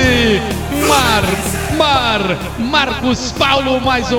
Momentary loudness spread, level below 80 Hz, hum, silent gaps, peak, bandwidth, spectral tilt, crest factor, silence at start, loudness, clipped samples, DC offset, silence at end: 6 LU; -28 dBFS; none; none; 0 dBFS; 18 kHz; -4 dB/octave; 14 dB; 0 s; -14 LUFS; under 0.1%; 0.3%; 0 s